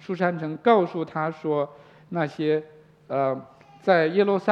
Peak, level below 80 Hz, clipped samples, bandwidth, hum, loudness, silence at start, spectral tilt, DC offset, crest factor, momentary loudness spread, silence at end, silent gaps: -4 dBFS; -74 dBFS; under 0.1%; 7.2 kHz; none; -25 LUFS; 0.1 s; -8 dB/octave; under 0.1%; 20 dB; 10 LU; 0 s; none